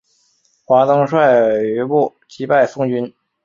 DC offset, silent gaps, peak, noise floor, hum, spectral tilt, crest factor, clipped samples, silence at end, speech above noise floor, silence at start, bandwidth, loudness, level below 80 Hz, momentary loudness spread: under 0.1%; none; -2 dBFS; -60 dBFS; none; -7.5 dB/octave; 14 dB; under 0.1%; 0.35 s; 45 dB; 0.7 s; 7.4 kHz; -15 LUFS; -62 dBFS; 10 LU